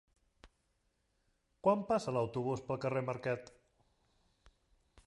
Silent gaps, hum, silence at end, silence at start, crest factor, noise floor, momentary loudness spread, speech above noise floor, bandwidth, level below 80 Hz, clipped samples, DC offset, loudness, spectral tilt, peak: none; none; 1.6 s; 0.45 s; 22 dB; -79 dBFS; 6 LU; 44 dB; 11.5 kHz; -70 dBFS; under 0.1%; under 0.1%; -36 LUFS; -7 dB/octave; -16 dBFS